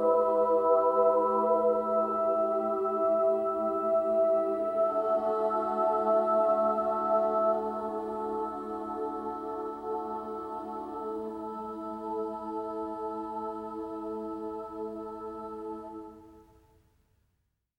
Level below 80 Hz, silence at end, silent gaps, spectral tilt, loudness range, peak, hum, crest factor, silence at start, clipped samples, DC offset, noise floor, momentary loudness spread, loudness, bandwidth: -66 dBFS; 1.35 s; none; -8 dB/octave; 12 LU; -12 dBFS; none; 18 dB; 0 s; under 0.1%; under 0.1%; -77 dBFS; 13 LU; -30 LUFS; 5 kHz